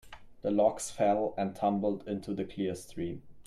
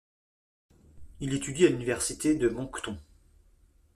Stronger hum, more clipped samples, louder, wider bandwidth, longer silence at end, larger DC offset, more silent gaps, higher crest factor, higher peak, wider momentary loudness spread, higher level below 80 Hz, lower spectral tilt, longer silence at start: neither; neither; second, -32 LUFS vs -29 LUFS; about the same, 13.5 kHz vs 14.5 kHz; second, 0.05 s vs 0.95 s; neither; neither; about the same, 18 dB vs 22 dB; second, -14 dBFS vs -10 dBFS; second, 10 LU vs 14 LU; second, -60 dBFS vs -54 dBFS; first, -6 dB/octave vs -4.5 dB/octave; second, 0.05 s vs 0.95 s